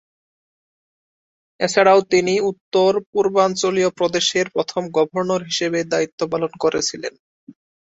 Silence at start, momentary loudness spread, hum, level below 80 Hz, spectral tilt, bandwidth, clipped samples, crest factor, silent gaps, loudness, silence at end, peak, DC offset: 1.6 s; 8 LU; none; -62 dBFS; -3.5 dB/octave; 8 kHz; under 0.1%; 20 dB; 2.61-2.71 s, 3.06-3.13 s, 6.12-6.18 s, 7.20-7.47 s; -19 LUFS; 0.4 s; 0 dBFS; under 0.1%